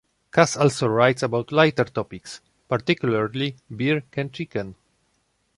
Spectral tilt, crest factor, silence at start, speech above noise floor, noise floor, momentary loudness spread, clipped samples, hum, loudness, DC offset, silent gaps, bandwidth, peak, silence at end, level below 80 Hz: -5.5 dB/octave; 20 dB; 0.35 s; 47 dB; -69 dBFS; 14 LU; under 0.1%; none; -22 LUFS; under 0.1%; none; 11.5 kHz; -2 dBFS; 0.85 s; -58 dBFS